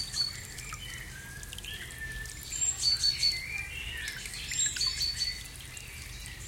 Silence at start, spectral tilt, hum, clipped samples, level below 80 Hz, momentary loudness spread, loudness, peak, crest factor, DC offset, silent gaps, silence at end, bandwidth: 0 s; 0 dB/octave; none; under 0.1%; -48 dBFS; 17 LU; -31 LUFS; -16 dBFS; 20 dB; under 0.1%; none; 0 s; 17 kHz